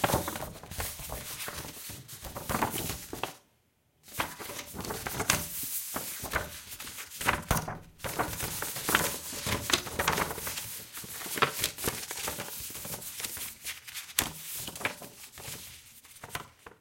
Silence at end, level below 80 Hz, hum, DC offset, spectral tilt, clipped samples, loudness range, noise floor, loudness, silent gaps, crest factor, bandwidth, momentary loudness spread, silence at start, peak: 0.05 s; -52 dBFS; none; under 0.1%; -2.5 dB/octave; under 0.1%; 6 LU; -70 dBFS; -33 LUFS; none; 30 dB; 17 kHz; 13 LU; 0 s; -4 dBFS